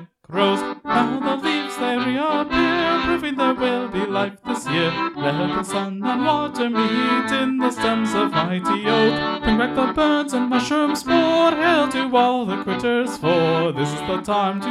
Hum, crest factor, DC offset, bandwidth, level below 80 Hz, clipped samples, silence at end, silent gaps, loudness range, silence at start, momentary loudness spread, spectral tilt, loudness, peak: none; 16 dB; under 0.1%; 14 kHz; -46 dBFS; under 0.1%; 0 s; none; 3 LU; 0 s; 6 LU; -5 dB/octave; -20 LUFS; -4 dBFS